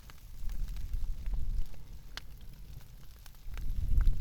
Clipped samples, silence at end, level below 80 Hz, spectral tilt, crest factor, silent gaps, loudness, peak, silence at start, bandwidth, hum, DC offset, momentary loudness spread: under 0.1%; 0 s; -34 dBFS; -5.5 dB/octave; 18 dB; none; -42 LUFS; -14 dBFS; 0.05 s; 16 kHz; none; under 0.1%; 17 LU